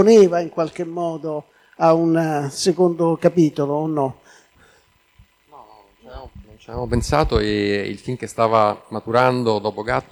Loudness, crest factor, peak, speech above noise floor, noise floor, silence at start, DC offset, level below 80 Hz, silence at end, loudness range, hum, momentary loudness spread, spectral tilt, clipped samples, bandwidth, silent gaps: -19 LUFS; 16 dB; -2 dBFS; 39 dB; -57 dBFS; 0 s; under 0.1%; -40 dBFS; 0.1 s; 9 LU; none; 12 LU; -6 dB/octave; under 0.1%; 19 kHz; none